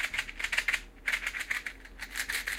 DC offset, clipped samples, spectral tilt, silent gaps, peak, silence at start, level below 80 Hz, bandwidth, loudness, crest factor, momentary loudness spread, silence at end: under 0.1%; under 0.1%; 0 dB/octave; none; -8 dBFS; 0 s; -52 dBFS; 16.5 kHz; -32 LUFS; 26 dB; 9 LU; 0 s